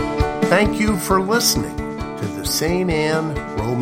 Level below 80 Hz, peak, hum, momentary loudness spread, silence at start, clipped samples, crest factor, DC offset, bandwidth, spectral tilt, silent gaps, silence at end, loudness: -32 dBFS; 0 dBFS; none; 10 LU; 0 s; under 0.1%; 18 dB; under 0.1%; 16.5 kHz; -4 dB/octave; none; 0 s; -19 LUFS